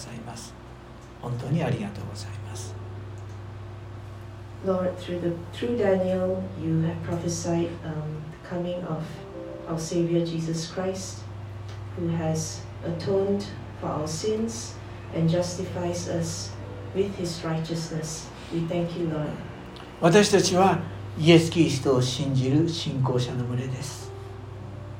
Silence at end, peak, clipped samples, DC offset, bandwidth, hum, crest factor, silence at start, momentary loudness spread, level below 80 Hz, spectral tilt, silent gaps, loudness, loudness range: 0 s; -4 dBFS; under 0.1%; under 0.1%; 16 kHz; none; 22 dB; 0 s; 17 LU; -50 dBFS; -5.5 dB/octave; none; -27 LUFS; 11 LU